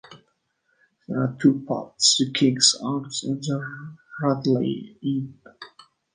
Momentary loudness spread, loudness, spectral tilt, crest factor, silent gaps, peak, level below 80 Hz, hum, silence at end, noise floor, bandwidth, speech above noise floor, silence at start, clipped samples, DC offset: 19 LU; -22 LUFS; -3.5 dB/octave; 22 dB; none; -4 dBFS; -68 dBFS; none; 0.5 s; -71 dBFS; 10 kHz; 47 dB; 0.1 s; under 0.1%; under 0.1%